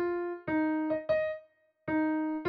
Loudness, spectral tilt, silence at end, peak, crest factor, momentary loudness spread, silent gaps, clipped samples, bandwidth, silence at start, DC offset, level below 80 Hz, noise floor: -32 LUFS; -9 dB/octave; 0 s; -20 dBFS; 12 dB; 7 LU; none; under 0.1%; 4.8 kHz; 0 s; under 0.1%; -66 dBFS; -58 dBFS